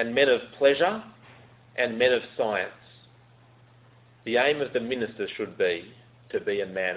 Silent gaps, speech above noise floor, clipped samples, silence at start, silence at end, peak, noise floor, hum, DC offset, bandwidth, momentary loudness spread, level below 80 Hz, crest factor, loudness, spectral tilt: none; 30 dB; under 0.1%; 0 s; 0 s; -8 dBFS; -56 dBFS; none; under 0.1%; 4 kHz; 12 LU; -66 dBFS; 20 dB; -26 LUFS; -8 dB/octave